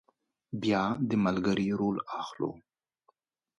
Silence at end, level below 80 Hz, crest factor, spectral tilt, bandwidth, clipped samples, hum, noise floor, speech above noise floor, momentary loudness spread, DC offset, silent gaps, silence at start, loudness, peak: 1 s; -64 dBFS; 18 dB; -7 dB/octave; 7.6 kHz; under 0.1%; none; -72 dBFS; 42 dB; 9 LU; under 0.1%; none; 0.5 s; -30 LUFS; -14 dBFS